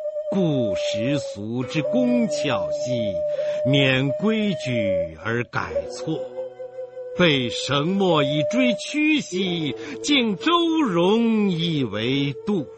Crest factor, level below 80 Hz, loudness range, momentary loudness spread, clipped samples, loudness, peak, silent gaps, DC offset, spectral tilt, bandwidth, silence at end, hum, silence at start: 18 dB; -56 dBFS; 4 LU; 10 LU; under 0.1%; -22 LUFS; -4 dBFS; none; under 0.1%; -5.5 dB/octave; 8.8 kHz; 0 s; none; 0 s